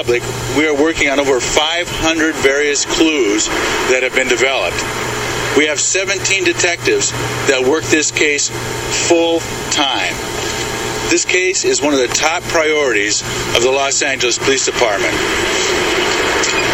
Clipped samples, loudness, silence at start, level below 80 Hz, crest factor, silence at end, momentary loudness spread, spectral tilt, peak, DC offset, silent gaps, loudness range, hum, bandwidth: under 0.1%; -14 LUFS; 0 s; -38 dBFS; 14 dB; 0 s; 5 LU; -2 dB/octave; 0 dBFS; under 0.1%; none; 1 LU; none; 16.5 kHz